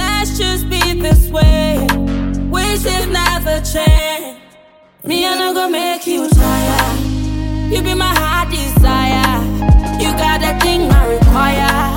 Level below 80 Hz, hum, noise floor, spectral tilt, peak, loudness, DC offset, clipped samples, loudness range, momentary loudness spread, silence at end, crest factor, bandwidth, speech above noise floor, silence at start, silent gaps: -16 dBFS; none; -45 dBFS; -5 dB/octave; 0 dBFS; -14 LUFS; under 0.1%; under 0.1%; 3 LU; 6 LU; 0 s; 12 dB; 17 kHz; 32 dB; 0 s; none